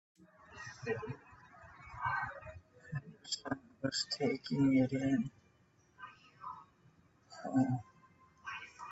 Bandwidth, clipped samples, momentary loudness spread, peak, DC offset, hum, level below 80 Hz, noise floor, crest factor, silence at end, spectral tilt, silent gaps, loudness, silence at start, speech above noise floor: 8.2 kHz; under 0.1%; 22 LU; -20 dBFS; under 0.1%; none; -70 dBFS; -70 dBFS; 20 dB; 0 s; -5.5 dB/octave; none; -37 LUFS; 0.2 s; 36 dB